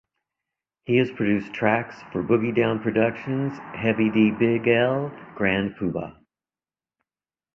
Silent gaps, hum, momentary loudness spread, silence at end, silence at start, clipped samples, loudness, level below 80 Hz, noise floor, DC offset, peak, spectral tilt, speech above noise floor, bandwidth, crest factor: none; none; 10 LU; 1.45 s; 0.9 s; under 0.1%; -23 LUFS; -58 dBFS; under -90 dBFS; under 0.1%; -4 dBFS; -8.5 dB/octave; over 67 dB; 6.2 kHz; 20 dB